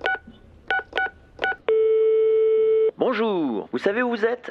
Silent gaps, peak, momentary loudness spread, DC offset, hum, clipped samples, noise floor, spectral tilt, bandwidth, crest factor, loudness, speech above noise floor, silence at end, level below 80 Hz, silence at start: none; -6 dBFS; 8 LU; under 0.1%; none; under 0.1%; -47 dBFS; -6 dB/octave; 6 kHz; 16 dB; -22 LUFS; 24 dB; 0 s; -58 dBFS; 0 s